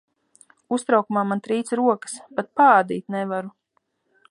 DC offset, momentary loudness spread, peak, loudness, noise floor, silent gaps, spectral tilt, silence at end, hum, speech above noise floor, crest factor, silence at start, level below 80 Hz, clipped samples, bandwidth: under 0.1%; 14 LU; -4 dBFS; -22 LUFS; -71 dBFS; none; -5.5 dB/octave; 0.8 s; none; 50 dB; 20 dB; 0.7 s; -76 dBFS; under 0.1%; 11.5 kHz